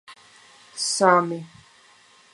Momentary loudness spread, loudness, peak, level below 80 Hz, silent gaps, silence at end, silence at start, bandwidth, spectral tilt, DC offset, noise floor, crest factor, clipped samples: 18 LU; -21 LUFS; -2 dBFS; -74 dBFS; none; 0.85 s; 0.1 s; 11.5 kHz; -3 dB/octave; under 0.1%; -54 dBFS; 24 dB; under 0.1%